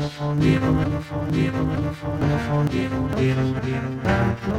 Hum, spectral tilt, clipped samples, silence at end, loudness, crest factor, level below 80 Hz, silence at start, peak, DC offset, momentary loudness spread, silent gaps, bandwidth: none; -7.5 dB/octave; under 0.1%; 0 s; -23 LUFS; 16 dB; -36 dBFS; 0 s; -6 dBFS; under 0.1%; 6 LU; none; 11 kHz